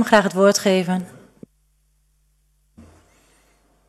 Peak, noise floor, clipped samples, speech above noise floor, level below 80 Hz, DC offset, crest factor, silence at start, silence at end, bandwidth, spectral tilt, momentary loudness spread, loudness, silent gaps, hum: 0 dBFS; -63 dBFS; under 0.1%; 46 dB; -60 dBFS; under 0.1%; 22 dB; 0 s; 1.05 s; 13.5 kHz; -4.5 dB/octave; 12 LU; -18 LUFS; none; 50 Hz at -65 dBFS